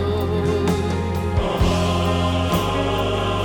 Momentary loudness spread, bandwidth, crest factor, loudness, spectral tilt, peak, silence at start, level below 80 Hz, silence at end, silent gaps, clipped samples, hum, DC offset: 3 LU; 18.5 kHz; 14 dB; -21 LUFS; -6 dB/octave; -6 dBFS; 0 s; -30 dBFS; 0 s; none; under 0.1%; none; under 0.1%